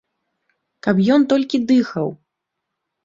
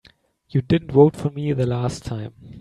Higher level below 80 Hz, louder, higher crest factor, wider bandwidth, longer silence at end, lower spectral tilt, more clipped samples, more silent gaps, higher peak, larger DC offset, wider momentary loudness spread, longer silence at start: second, -60 dBFS vs -48 dBFS; first, -18 LUFS vs -21 LUFS; about the same, 16 dB vs 20 dB; second, 7.6 kHz vs 11.5 kHz; first, 0.9 s vs 0 s; about the same, -7 dB/octave vs -8 dB/octave; neither; neither; about the same, -2 dBFS vs 0 dBFS; neither; second, 11 LU vs 15 LU; first, 0.85 s vs 0.55 s